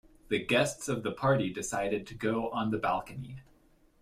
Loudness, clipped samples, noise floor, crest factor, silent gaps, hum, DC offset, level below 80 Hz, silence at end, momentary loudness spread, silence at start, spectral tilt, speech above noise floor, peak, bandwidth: -31 LUFS; under 0.1%; -64 dBFS; 18 dB; none; none; under 0.1%; -58 dBFS; 0.6 s; 13 LU; 0.3 s; -5 dB/octave; 33 dB; -14 dBFS; 16 kHz